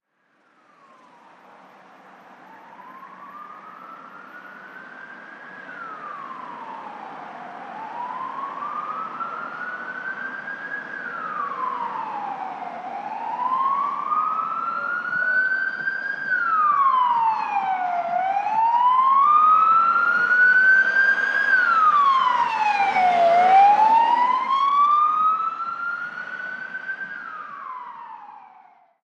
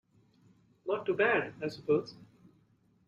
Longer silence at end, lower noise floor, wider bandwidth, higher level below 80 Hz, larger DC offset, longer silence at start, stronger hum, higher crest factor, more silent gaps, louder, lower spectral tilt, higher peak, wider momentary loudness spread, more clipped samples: second, 0.65 s vs 0.85 s; second, -64 dBFS vs -68 dBFS; first, 9 kHz vs 7.4 kHz; second, -90 dBFS vs -74 dBFS; neither; first, 2.3 s vs 0.85 s; neither; about the same, 16 dB vs 20 dB; neither; first, -20 LUFS vs -32 LUFS; second, -3 dB/octave vs -6.5 dB/octave; first, -6 dBFS vs -16 dBFS; first, 24 LU vs 14 LU; neither